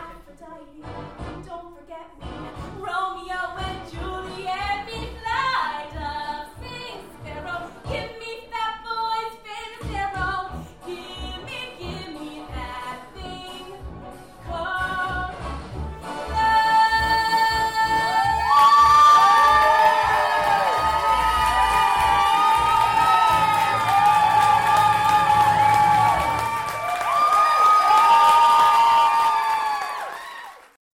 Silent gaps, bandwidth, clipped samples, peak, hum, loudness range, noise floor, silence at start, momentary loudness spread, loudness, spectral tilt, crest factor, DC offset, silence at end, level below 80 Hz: none; 16.5 kHz; under 0.1%; -8 dBFS; none; 16 LU; -43 dBFS; 0 s; 21 LU; -18 LUFS; -3 dB/octave; 12 dB; 0.2%; 0.4 s; -42 dBFS